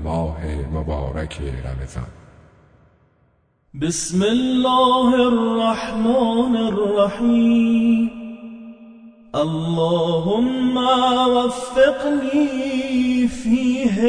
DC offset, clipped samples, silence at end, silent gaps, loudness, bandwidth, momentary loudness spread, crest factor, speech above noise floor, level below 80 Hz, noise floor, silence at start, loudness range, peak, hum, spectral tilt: under 0.1%; under 0.1%; 0 s; none; -19 LUFS; 10 kHz; 13 LU; 16 dB; 43 dB; -38 dBFS; -61 dBFS; 0 s; 11 LU; -4 dBFS; none; -5.5 dB/octave